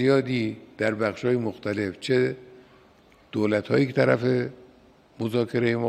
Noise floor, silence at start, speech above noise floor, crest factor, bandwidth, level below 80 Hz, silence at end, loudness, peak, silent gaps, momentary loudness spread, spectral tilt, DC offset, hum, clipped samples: -56 dBFS; 0 s; 32 dB; 18 dB; 12.5 kHz; -66 dBFS; 0 s; -25 LUFS; -6 dBFS; none; 9 LU; -7 dB/octave; under 0.1%; none; under 0.1%